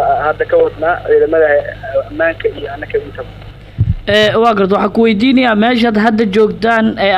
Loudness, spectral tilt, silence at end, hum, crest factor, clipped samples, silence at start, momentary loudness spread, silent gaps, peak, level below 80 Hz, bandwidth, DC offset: -12 LUFS; -6.5 dB/octave; 0 s; none; 10 dB; under 0.1%; 0 s; 10 LU; none; -2 dBFS; -34 dBFS; 11 kHz; under 0.1%